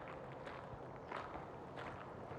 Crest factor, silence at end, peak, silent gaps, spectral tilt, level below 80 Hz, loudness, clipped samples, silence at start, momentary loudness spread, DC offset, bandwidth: 18 dB; 0 s; -32 dBFS; none; -6.5 dB/octave; -68 dBFS; -50 LUFS; under 0.1%; 0 s; 3 LU; under 0.1%; 17 kHz